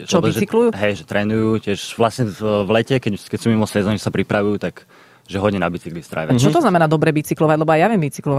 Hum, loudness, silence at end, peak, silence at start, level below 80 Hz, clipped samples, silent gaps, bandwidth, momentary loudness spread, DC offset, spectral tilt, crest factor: none; -18 LUFS; 0 s; -2 dBFS; 0 s; -50 dBFS; under 0.1%; none; 15.5 kHz; 9 LU; under 0.1%; -6 dB/octave; 16 dB